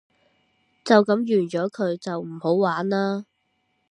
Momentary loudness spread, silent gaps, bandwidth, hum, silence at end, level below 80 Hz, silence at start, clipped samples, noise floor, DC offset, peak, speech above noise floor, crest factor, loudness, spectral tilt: 12 LU; none; 10.5 kHz; none; 0.7 s; -74 dBFS; 0.85 s; under 0.1%; -71 dBFS; under 0.1%; -2 dBFS; 50 dB; 22 dB; -23 LUFS; -6.5 dB/octave